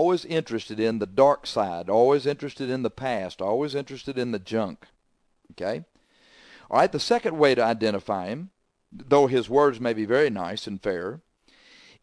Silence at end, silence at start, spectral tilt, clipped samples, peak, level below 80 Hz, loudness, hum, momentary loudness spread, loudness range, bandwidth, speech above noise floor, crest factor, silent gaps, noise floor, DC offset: 0.85 s; 0 s; -5.5 dB/octave; under 0.1%; -6 dBFS; -62 dBFS; -25 LUFS; none; 12 LU; 7 LU; 11 kHz; 45 dB; 20 dB; none; -69 dBFS; under 0.1%